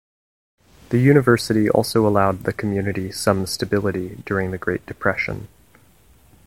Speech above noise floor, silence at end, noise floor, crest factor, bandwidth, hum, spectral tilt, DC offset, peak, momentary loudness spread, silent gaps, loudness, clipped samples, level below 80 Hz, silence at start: 34 dB; 1 s; -54 dBFS; 20 dB; 16.5 kHz; none; -6 dB/octave; 0.2%; 0 dBFS; 10 LU; none; -20 LUFS; under 0.1%; -48 dBFS; 0.9 s